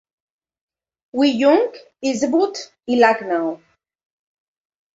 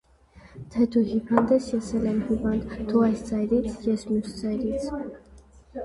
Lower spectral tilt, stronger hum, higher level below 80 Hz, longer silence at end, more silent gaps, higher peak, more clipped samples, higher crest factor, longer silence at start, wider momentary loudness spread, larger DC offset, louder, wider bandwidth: second, -4 dB/octave vs -7 dB/octave; neither; second, -68 dBFS vs -46 dBFS; first, 1.4 s vs 0 s; neither; about the same, -2 dBFS vs -2 dBFS; neither; second, 18 dB vs 24 dB; first, 1.15 s vs 0.35 s; about the same, 12 LU vs 10 LU; neither; first, -18 LUFS vs -25 LUFS; second, 8 kHz vs 11.5 kHz